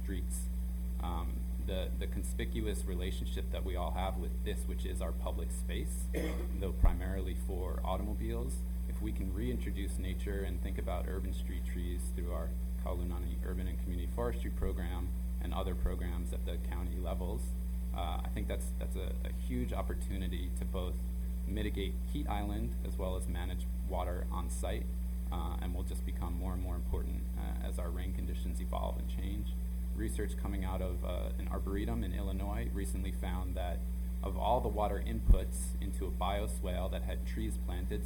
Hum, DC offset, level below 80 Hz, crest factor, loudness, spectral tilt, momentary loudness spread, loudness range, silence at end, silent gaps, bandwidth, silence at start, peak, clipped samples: none; under 0.1%; -36 dBFS; 24 dB; -38 LUFS; -6.5 dB/octave; 3 LU; 3 LU; 0 s; none; 18 kHz; 0 s; -12 dBFS; under 0.1%